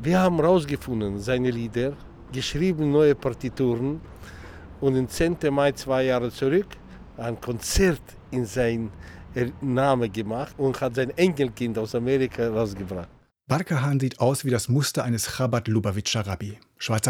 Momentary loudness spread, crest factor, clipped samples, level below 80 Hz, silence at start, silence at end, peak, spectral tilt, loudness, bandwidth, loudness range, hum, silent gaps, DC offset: 13 LU; 16 dB; under 0.1%; -44 dBFS; 0 s; 0 s; -8 dBFS; -5.5 dB/octave; -25 LUFS; 18.5 kHz; 2 LU; none; none; under 0.1%